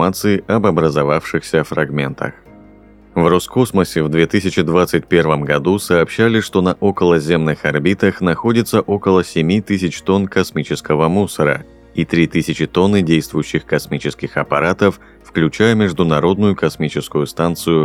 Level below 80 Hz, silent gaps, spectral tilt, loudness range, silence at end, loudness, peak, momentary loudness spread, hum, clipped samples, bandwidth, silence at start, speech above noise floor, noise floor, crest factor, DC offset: -44 dBFS; none; -6 dB/octave; 3 LU; 0 s; -16 LUFS; 0 dBFS; 6 LU; none; under 0.1%; 16.5 kHz; 0 s; 28 dB; -43 dBFS; 16 dB; under 0.1%